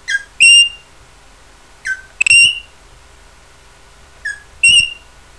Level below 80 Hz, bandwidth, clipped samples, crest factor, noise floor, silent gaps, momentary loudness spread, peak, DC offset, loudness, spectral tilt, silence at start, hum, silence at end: -46 dBFS; 11 kHz; under 0.1%; 16 dB; -44 dBFS; none; 21 LU; 0 dBFS; 0.3%; -8 LUFS; 3 dB/octave; 0.1 s; none; 0.45 s